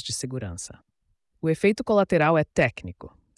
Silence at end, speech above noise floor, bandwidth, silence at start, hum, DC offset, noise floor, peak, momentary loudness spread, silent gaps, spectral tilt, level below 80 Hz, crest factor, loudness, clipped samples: 0.3 s; 43 dB; 12 kHz; 0 s; none; under 0.1%; -67 dBFS; -10 dBFS; 18 LU; none; -5.5 dB/octave; -54 dBFS; 16 dB; -23 LUFS; under 0.1%